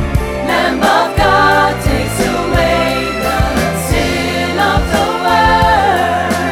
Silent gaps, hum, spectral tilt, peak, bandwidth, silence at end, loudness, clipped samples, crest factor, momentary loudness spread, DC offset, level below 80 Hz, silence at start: none; none; -4.5 dB/octave; 0 dBFS; 18 kHz; 0 s; -12 LUFS; under 0.1%; 12 dB; 6 LU; under 0.1%; -24 dBFS; 0 s